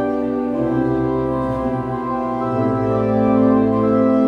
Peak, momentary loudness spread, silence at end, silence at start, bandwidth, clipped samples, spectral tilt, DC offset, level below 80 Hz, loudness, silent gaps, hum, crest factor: -4 dBFS; 7 LU; 0 s; 0 s; 5.6 kHz; under 0.1%; -10 dB/octave; under 0.1%; -42 dBFS; -18 LUFS; none; none; 12 dB